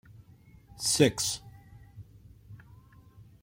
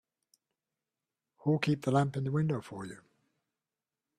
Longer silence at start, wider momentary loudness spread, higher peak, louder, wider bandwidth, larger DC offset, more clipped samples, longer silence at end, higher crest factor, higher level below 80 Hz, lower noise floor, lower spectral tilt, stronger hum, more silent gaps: second, 0.75 s vs 1.45 s; first, 28 LU vs 15 LU; first, -8 dBFS vs -16 dBFS; first, -27 LUFS vs -32 LUFS; first, 16.5 kHz vs 12 kHz; neither; neither; second, 0.85 s vs 1.25 s; first, 26 dB vs 20 dB; first, -58 dBFS vs -70 dBFS; second, -56 dBFS vs under -90 dBFS; second, -3.5 dB/octave vs -7.5 dB/octave; neither; neither